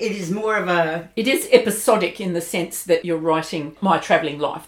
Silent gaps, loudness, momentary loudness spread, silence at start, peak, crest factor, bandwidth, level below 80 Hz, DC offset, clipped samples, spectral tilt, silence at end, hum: none; -20 LUFS; 9 LU; 0 s; 0 dBFS; 20 dB; 18 kHz; -60 dBFS; under 0.1%; under 0.1%; -4 dB/octave; 0 s; none